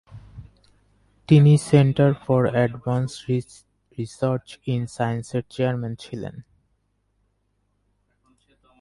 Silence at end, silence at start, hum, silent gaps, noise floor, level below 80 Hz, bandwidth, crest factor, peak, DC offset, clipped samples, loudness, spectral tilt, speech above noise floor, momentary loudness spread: 2.4 s; 0.1 s; none; none; -70 dBFS; -54 dBFS; 11.5 kHz; 20 dB; -4 dBFS; under 0.1%; under 0.1%; -21 LUFS; -7.5 dB/octave; 49 dB; 18 LU